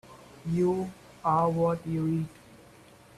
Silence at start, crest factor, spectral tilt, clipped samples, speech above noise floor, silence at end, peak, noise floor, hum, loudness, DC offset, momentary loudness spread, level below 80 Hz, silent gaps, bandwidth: 0.1 s; 16 dB; -8.5 dB/octave; under 0.1%; 27 dB; 0.6 s; -12 dBFS; -54 dBFS; none; -29 LUFS; under 0.1%; 13 LU; -60 dBFS; none; 13 kHz